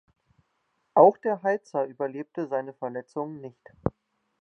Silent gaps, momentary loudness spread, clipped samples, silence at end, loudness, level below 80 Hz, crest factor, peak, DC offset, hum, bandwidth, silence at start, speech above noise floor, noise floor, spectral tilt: none; 17 LU; under 0.1%; 0.5 s; -26 LUFS; -56 dBFS; 24 dB; -2 dBFS; under 0.1%; none; 8 kHz; 0.95 s; 49 dB; -74 dBFS; -9 dB/octave